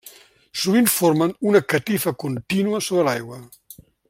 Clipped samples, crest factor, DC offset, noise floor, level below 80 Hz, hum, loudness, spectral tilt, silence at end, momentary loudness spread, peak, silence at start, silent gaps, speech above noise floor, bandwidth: under 0.1%; 18 dB; under 0.1%; -47 dBFS; -62 dBFS; none; -20 LUFS; -4.5 dB/octave; 0.65 s; 12 LU; -2 dBFS; 0.05 s; none; 27 dB; 16.5 kHz